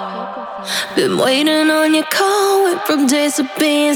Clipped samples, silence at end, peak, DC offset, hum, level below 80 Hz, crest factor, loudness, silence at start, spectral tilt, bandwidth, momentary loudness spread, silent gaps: under 0.1%; 0 s; -2 dBFS; under 0.1%; none; -68 dBFS; 14 dB; -14 LUFS; 0 s; -2.5 dB/octave; 19.5 kHz; 10 LU; none